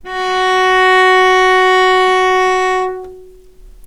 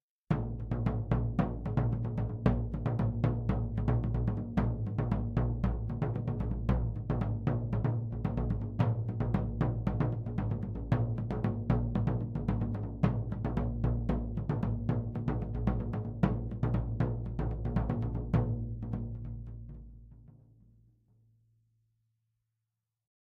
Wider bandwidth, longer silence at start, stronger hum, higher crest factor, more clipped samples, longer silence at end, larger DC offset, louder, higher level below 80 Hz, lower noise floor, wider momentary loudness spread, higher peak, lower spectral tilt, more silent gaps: first, 12.5 kHz vs 4.6 kHz; second, 0.05 s vs 0.3 s; neither; second, 12 dB vs 20 dB; neither; second, 0.2 s vs 2.9 s; neither; first, -10 LUFS vs -33 LUFS; about the same, -42 dBFS vs -40 dBFS; second, -38 dBFS vs -87 dBFS; first, 9 LU vs 4 LU; first, 0 dBFS vs -12 dBFS; second, -2 dB/octave vs -10.5 dB/octave; neither